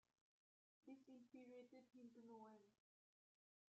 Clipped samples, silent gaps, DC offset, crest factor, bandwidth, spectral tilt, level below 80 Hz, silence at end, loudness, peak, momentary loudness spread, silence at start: under 0.1%; none; under 0.1%; 16 dB; 7.6 kHz; -5 dB/octave; under -90 dBFS; 1 s; -65 LUFS; -52 dBFS; 3 LU; 0.85 s